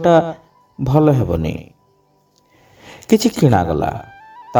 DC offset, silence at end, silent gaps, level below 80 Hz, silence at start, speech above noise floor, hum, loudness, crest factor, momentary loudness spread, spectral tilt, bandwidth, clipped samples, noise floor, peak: under 0.1%; 0 s; none; -40 dBFS; 0 s; 43 dB; none; -16 LUFS; 18 dB; 19 LU; -7 dB/octave; over 20 kHz; under 0.1%; -58 dBFS; 0 dBFS